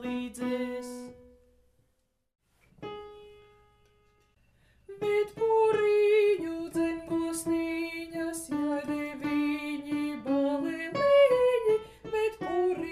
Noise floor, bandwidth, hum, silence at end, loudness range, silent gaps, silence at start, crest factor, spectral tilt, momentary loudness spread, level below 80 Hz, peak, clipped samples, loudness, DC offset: -74 dBFS; 15 kHz; none; 0 s; 13 LU; none; 0 s; 18 dB; -4.5 dB/octave; 14 LU; -62 dBFS; -12 dBFS; under 0.1%; -28 LUFS; under 0.1%